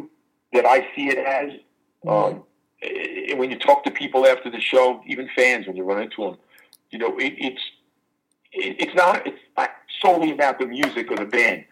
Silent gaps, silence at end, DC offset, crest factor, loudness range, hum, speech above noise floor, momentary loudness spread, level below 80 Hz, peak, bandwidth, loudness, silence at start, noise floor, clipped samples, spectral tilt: none; 0.1 s; under 0.1%; 18 dB; 5 LU; none; 50 dB; 13 LU; -80 dBFS; -2 dBFS; 14.5 kHz; -21 LUFS; 0 s; -71 dBFS; under 0.1%; -4 dB/octave